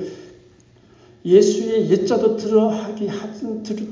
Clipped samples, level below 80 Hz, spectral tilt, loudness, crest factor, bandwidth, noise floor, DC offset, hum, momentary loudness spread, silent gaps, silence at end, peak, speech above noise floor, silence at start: under 0.1%; -60 dBFS; -6 dB/octave; -19 LUFS; 18 dB; 7.6 kHz; -51 dBFS; under 0.1%; none; 14 LU; none; 0 s; -2 dBFS; 33 dB; 0 s